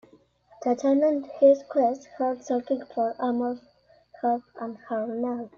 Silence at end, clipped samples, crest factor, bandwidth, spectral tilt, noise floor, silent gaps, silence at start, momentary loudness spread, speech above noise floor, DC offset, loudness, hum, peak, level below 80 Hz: 0.1 s; under 0.1%; 18 dB; 7.2 kHz; -6 dB/octave; -58 dBFS; none; 0.6 s; 12 LU; 33 dB; under 0.1%; -26 LUFS; 60 Hz at -50 dBFS; -8 dBFS; -72 dBFS